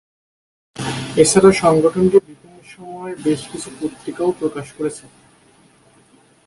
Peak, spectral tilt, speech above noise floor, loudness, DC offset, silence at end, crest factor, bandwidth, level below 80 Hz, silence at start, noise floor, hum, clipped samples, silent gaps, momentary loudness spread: 0 dBFS; -5 dB/octave; 36 dB; -17 LUFS; under 0.1%; 1.45 s; 18 dB; 11.5 kHz; -50 dBFS; 0.8 s; -52 dBFS; none; under 0.1%; none; 20 LU